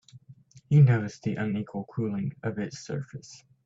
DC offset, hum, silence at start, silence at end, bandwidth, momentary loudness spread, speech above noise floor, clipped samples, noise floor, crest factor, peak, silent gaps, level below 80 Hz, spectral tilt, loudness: under 0.1%; none; 0.15 s; 0.3 s; 7.8 kHz; 16 LU; 27 dB; under 0.1%; -54 dBFS; 18 dB; -10 dBFS; none; -64 dBFS; -8 dB/octave; -27 LUFS